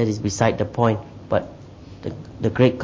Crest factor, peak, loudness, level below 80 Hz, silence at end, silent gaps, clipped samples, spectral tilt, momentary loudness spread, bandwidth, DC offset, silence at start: 20 dB; -2 dBFS; -22 LUFS; -44 dBFS; 0 s; none; under 0.1%; -6.5 dB/octave; 18 LU; 7.8 kHz; under 0.1%; 0 s